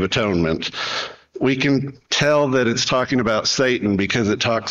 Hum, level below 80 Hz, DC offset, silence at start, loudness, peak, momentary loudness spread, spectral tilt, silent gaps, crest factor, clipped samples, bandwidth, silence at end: none; -48 dBFS; under 0.1%; 0 s; -19 LUFS; -6 dBFS; 6 LU; -4.5 dB/octave; none; 14 dB; under 0.1%; 8 kHz; 0 s